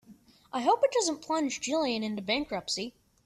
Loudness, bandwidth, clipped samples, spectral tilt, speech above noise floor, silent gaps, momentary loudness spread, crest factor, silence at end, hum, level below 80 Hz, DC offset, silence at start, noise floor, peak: -30 LUFS; 13.5 kHz; under 0.1%; -3 dB/octave; 28 dB; none; 8 LU; 18 dB; 0.35 s; none; -66 dBFS; under 0.1%; 0.1 s; -57 dBFS; -12 dBFS